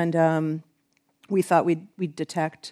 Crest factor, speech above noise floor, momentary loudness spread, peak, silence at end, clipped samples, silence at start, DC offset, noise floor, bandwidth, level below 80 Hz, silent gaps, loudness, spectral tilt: 20 dB; 46 dB; 10 LU; -6 dBFS; 0 s; under 0.1%; 0 s; under 0.1%; -70 dBFS; 14 kHz; -78 dBFS; none; -25 LUFS; -7 dB/octave